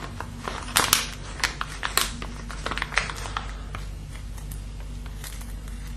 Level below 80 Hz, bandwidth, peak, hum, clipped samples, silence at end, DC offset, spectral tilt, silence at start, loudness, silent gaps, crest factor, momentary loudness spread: -36 dBFS; 13.5 kHz; 0 dBFS; none; under 0.1%; 0 s; under 0.1%; -2 dB/octave; 0 s; -28 LUFS; none; 30 dB; 16 LU